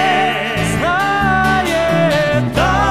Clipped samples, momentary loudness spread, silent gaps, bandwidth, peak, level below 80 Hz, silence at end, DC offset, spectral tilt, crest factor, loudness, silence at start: under 0.1%; 3 LU; none; 15.5 kHz; -2 dBFS; -30 dBFS; 0 s; 0.9%; -5 dB/octave; 12 dB; -14 LUFS; 0 s